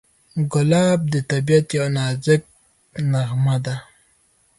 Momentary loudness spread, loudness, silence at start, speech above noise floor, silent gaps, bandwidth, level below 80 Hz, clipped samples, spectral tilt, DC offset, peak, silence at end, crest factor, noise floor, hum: 11 LU; -20 LUFS; 0.35 s; 42 dB; none; 11.5 kHz; -56 dBFS; under 0.1%; -6.5 dB/octave; under 0.1%; -2 dBFS; 0.75 s; 18 dB; -60 dBFS; none